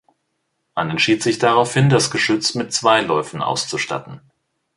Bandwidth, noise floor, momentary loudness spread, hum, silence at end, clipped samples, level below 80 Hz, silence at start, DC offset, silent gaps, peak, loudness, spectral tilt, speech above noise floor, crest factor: 11.5 kHz; -72 dBFS; 9 LU; none; 0.6 s; under 0.1%; -56 dBFS; 0.75 s; under 0.1%; none; -2 dBFS; -18 LUFS; -4 dB/octave; 54 dB; 18 dB